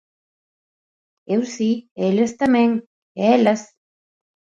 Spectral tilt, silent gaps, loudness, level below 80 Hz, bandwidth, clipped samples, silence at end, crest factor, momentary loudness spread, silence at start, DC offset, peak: -6 dB/octave; 1.91-1.96 s, 2.86-3.15 s; -19 LUFS; -64 dBFS; 7.8 kHz; under 0.1%; 0.95 s; 18 dB; 9 LU; 1.3 s; under 0.1%; -4 dBFS